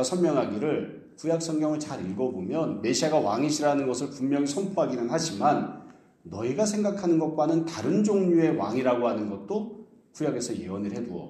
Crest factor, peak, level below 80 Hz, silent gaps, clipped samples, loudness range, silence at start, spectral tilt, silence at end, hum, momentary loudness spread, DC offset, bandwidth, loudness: 18 dB; -10 dBFS; -68 dBFS; none; under 0.1%; 2 LU; 0 s; -5.5 dB/octave; 0 s; none; 9 LU; under 0.1%; 12.5 kHz; -27 LUFS